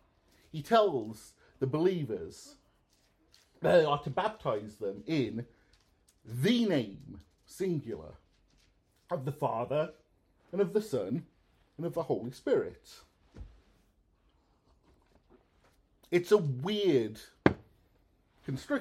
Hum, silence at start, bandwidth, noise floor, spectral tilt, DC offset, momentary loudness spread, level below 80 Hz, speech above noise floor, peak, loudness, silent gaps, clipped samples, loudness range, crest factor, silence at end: none; 0.55 s; 15 kHz; -70 dBFS; -6.5 dB/octave; under 0.1%; 20 LU; -62 dBFS; 39 dB; -6 dBFS; -32 LUFS; none; under 0.1%; 6 LU; 28 dB; 0 s